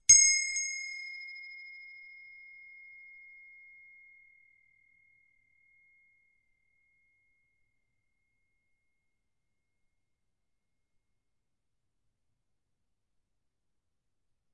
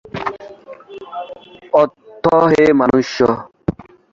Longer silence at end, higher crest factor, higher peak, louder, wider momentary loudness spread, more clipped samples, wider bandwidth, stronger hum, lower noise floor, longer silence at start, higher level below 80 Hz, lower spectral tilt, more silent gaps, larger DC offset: first, 12.8 s vs 0.3 s; first, 30 dB vs 16 dB; second, -8 dBFS vs -2 dBFS; second, -25 LUFS vs -15 LUFS; first, 29 LU vs 23 LU; neither; about the same, 8.2 kHz vs 7.6 kHz; neither; first, -86 dBFS vs -36 dBFS; about the same, 0.1 s vs 0.15 s; second, -74 dBFS vs -46 dBFS; second, 4 dB/octave vs -6.5 dB/octave; neither; neither